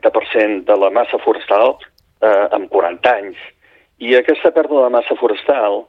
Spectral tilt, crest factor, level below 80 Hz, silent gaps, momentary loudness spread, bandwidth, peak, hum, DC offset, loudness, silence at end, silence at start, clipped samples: -5.5 dB/octave; 14 dB; -60 dBFS; none; 4 LU; 5.4 kHz; -2 dBFS; none; under 0.1%; -14 LUFS; 0.05 s; 0.05 s; under 0.1%